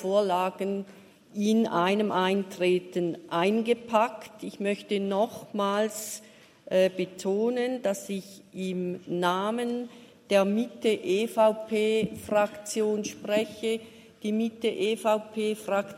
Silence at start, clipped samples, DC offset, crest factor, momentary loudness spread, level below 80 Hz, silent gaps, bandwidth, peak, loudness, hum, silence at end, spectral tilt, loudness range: 0 s; under 0.1%; under 0.1%; 20 dB; 10 LU; -74 dBFS; none; 16 kHz; -8 dBFS; -28 LUFS; none; 0 s; -5 dB/octave; 3 LU